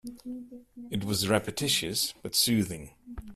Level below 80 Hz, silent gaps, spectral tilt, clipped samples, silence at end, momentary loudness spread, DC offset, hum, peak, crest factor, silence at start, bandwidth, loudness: -54 dBFS; none; -3.5 dB/octave; under 0.1%; 0 s; 20 LU; under 0.1%; none; -10 dBFS; 22 dB; 0.05 s; 15 kHz; -28 LUFS